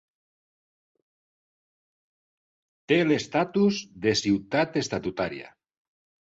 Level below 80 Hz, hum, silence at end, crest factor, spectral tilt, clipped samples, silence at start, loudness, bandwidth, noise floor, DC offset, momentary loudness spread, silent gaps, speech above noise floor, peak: -62 dBFS; none; 0.8 s; 18 dB; -5 dB/octave; under 0.1%; 2.9 s; -25 LUFS; 8 kHz; under -90 dBFS; under 0.1%; 8 LU; none; over 65 dB; -10 dBFS